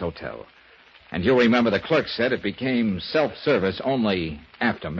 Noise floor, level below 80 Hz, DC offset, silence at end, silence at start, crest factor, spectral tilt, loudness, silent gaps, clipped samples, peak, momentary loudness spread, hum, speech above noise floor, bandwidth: -52 dBFS; -52 dBFS; under 0.1%; 0 s; 0 s; 16 dB; -7 dB/octave; -23 LUFS; none; under 0.1%; -6 dBFS; 14 LU; none; 29 dB; 7 kHz